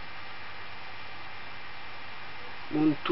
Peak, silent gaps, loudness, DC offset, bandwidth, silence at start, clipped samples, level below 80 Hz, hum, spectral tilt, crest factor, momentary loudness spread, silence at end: -16 dBFS; none; -36 LUFS; 2%; 5.8 kHz; 0 s; under 0.1%; -64 dBFS; none; -9 dB/octave; 18 dB; 14 LU; 0 s